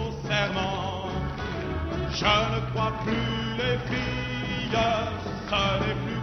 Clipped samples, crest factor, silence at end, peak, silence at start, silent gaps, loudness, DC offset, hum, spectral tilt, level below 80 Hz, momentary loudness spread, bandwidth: under 0.1%; 20 dB; 0 s; -8 dBFS; 0 s; none; -27 LUFS; under 0.1%; none; -5.5 dB/octave; -40 dBFS; 8 LU; 6.4 kHz